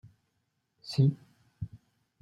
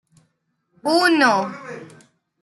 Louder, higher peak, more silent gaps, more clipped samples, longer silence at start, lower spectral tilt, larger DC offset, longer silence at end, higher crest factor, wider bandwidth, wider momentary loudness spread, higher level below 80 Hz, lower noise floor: second, -29 LUFS vs -18 LUFS; second, -14 dBFS vs -4 dBFS; neither; neither; about the same, 0.85 s vs 0.85 s; first, -8 dB/octave vs -3.5 dB/octave; neither; about the same, 0.45 s vs 0.55 s; about the same, 20 dB vs 18 dB; about the same, 11.5 kHz vs 12 kHz; about the same, 20 LU vs 21 LU; first, -64 dBFS vs -72 dBFS; first, -79 dBFS vs -70 dBFS